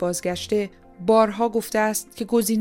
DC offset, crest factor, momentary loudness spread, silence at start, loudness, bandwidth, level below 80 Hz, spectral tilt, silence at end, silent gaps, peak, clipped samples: under 0.1%; 16 dB; 9 LU; 0 s; -22 LUFS; 17 kHz; -54 dBFS; -4 dB/octave; 0 s; none; -6 dBFS; under 0.1%